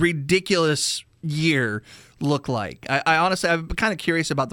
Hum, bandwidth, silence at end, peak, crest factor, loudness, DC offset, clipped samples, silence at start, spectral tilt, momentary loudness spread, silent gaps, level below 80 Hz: none; 18 kHz; 0 s; -4 dBFS; 18 dB; -22 LUFS; under 0.1%; under 0.1%; 0 s; -4.5 dB/octave; 9 LU; none; -44 dBFS